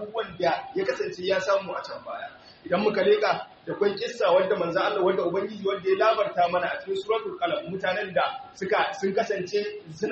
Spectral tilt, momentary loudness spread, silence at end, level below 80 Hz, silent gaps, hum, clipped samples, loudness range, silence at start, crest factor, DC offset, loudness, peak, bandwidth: -2.5 dB/octave; 12 LU; 0 s; -66 dBFS; none; none; under 0.1%; 3 LU; 0 s; 16 dB; under 0.1%; -26 LUFS; -10 dBFS; 8 kHz